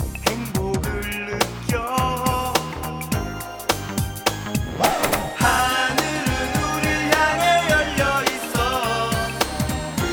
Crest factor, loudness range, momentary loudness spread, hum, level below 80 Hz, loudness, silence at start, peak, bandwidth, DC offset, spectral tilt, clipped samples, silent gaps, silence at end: 22 dB; 5 LU; 8 LU; none; -36 dBFS; -21 LUFS; 0 s; 0 dBFS; over 20 kHz; under 0.1%; -4 dB/octave; under 0.1%; none; 0 s